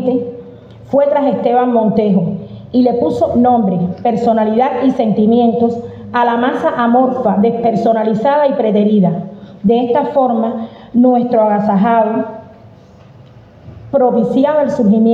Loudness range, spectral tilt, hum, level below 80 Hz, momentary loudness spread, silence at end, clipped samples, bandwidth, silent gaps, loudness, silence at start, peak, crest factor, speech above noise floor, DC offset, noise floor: 2 LU; -9 dB/octave; none; -52 dBFS; 8 LU; 0 s; under 0.1%; 7.4 kHz; none; -13 LUFS; 0 s; -2 dBFS; 12 dB; 28 dB; under 0.1%; -40 dBFS